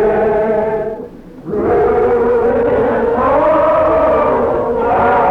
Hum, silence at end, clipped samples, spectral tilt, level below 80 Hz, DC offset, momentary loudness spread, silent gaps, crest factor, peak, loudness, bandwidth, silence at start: none; 0 s; under 0.1%; -8.5 dB/octave; -36 dBFS; under 0.1%; 9 LU; none; 8 dB; -4 dBFS; -13 LUFS; 5.6 kHz; 0 s